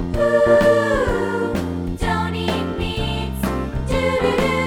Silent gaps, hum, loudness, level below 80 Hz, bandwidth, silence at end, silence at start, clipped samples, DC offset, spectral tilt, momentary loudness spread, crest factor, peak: none; none; -19 LUFS; -30 dBFS; 17.5 kHz; 0 s; 0 s; under 0.1%; under 0.1%; -6 dB/octave; 10 LU; 16 dB; -4 dBFS